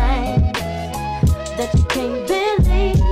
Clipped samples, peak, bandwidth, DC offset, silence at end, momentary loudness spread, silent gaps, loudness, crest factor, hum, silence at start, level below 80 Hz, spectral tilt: under 0.1%; -6 dBFS; 15.5 kHz; under 0.1%; 0 s; 7 LU; none; -19 LUFS; 10 dB; none; 0 s; -20 dBFS; -6 dB/octave